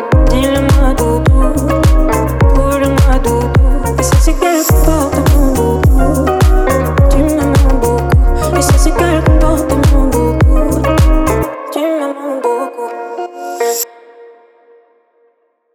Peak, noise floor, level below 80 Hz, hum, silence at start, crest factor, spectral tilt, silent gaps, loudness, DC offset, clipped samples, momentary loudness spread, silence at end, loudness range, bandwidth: 0 dBFS; -57 dBFS; -14 dBFS; none; 0 s; 10 dB; -6 dB/octave; none; -12 LUFS; under 0.1%; under 0.1%; 7 LU; 1.5 s; 7 LU; 19 kHz